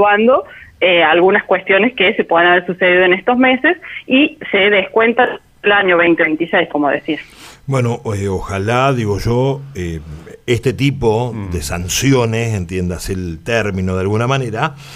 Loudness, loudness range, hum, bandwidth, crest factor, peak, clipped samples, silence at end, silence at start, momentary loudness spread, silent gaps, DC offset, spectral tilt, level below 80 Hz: -14 LUFS; 6 LU; none; 15.5 kHz; 12 dB; -2 dBFS; under 0.1%; 0 s; 0 s; 11 LU; none; under 0.1%; -5 dB/octave; -38 dBFS